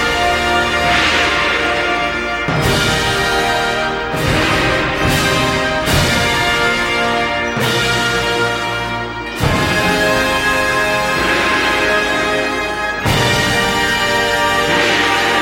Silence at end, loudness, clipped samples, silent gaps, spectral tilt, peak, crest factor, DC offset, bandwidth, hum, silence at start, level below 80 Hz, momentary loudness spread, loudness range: 0 s; -14 LUFS; under 0.1%; none; -3.5 dB/octave; -2 dBFS; 14 dB; under 0.1%; 16.5 kHz; none; 0 s; -32 dBFS; 5 LU; 1 LU